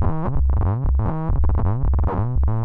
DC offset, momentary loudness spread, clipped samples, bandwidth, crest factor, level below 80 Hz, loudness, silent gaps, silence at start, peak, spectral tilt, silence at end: under 0.1%; 2 LU; under 0.1%; 2.7 kHz; 10 dB; -20 dBFS; -22 LUFS; none; 0 s; -8 dBFS; -12.5 dB/octave; 0 s